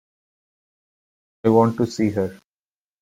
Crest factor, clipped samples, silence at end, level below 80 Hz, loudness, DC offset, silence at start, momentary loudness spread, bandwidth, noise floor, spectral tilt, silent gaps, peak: 20 dB; under 0.1%; 0.65 s; -60 dBFS; -20 LUFS; under 0.1%; 1.45 s; 9 LU; 15 kHz; under -90 dBFS; -7.5 dB/octave; none; -4 dBFS